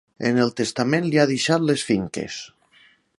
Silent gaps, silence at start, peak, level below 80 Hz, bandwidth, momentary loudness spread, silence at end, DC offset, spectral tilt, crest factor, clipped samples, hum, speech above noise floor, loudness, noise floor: none; 0.2 s; -4 dBFS; -58 dBFS; 11.5 kHz; 12 LU; 0.7 s; under 0.1%; -5 dB/octave; 20 dB; under 0.1%; none; 35 dB; -21 LUFS; -56 dBFS